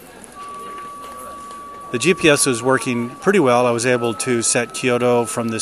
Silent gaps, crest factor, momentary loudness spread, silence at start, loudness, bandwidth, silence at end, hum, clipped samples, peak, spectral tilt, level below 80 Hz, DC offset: none; 18 dB; 19 LU; 0 s; -17 LUFS; 14 kHz; 0 s; none; under 0.1%; 0 dBFS; -3.5 dB/octave; -56 dBFS; under 0.1%